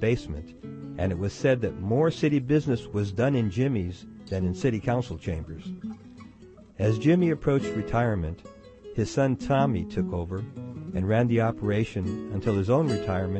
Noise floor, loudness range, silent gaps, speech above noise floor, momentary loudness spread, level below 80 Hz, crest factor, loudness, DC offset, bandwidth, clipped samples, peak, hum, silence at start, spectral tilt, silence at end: -50 dBFS; 3 LU; none; 24 dB; 15 LU; -48 dBFS; 16 dB; -27 LUFS; under 0.1%; 8.6 kHz; under 0.1%; -10 dBFS; none; 0 s; -7.5 dB/octave; 0 s